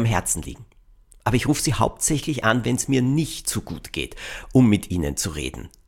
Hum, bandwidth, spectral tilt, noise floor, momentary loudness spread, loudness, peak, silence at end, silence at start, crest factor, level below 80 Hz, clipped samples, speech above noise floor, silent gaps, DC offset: none; 17 kHz; -4.5 dB/octave; -52 dBFS; 12 LU; -22 LUFS; -4 dBFS; 0.2 s; 0 s; 18 dB; -40 dBFS; under 0.1%; 29 dB; none; under 0.1%